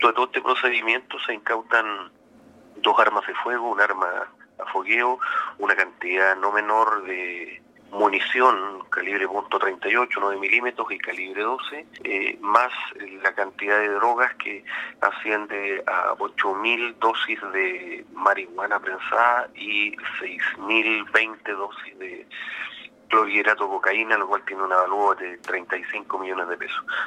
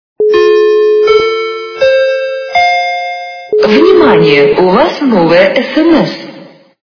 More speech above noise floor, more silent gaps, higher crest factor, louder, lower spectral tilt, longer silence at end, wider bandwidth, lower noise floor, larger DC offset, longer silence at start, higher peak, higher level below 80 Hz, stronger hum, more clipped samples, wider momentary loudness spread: about the same, 27 dB vs 27 dB; neither; first, 22 dB vs 8 dB; second, -23 LUFS vs -8 LUFS; second, -3 dB/octave vs -6 dB/octave; second, 0 s vs 0.35 s; first, 11 kHz vs 5.4 kHz; first, -51 dBFS vs -34 dBFS; neither; second, 0 s vs 0.2 s; about the same, 0 dBFS vs 0 dBFS; second, -76 dBFS vs -44 dBFS; neither; second, under 0.1% vs 0.9%; about the same, 11 LU vs 10 LU